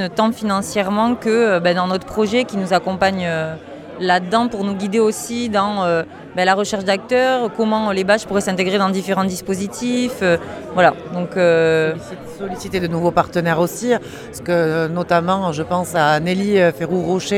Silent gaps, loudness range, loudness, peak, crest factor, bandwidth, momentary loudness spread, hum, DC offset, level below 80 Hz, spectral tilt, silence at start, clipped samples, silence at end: none; 1 LU; -18 LUFS; 0 dBFS; 18 dB; 16 kHz; 8 LU; none; under 0.1%; -50 dBFS; -5 dB/octave; 0 s; under 0.1%; 0 s